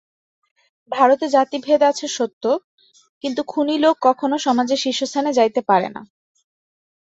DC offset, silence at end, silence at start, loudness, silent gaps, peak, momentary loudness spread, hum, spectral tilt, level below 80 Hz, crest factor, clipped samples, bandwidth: under 0.1%; 1 s; 0.9 s; -19 LUFS; 2.33-2.41 s, 2.64-2.78 s, 3.09-3.21 s; -2 dBFS; 9 LU; none; -3.5 dB/octave; -68 dBFS; 18 dB; under 0.1%; 8.2 kHz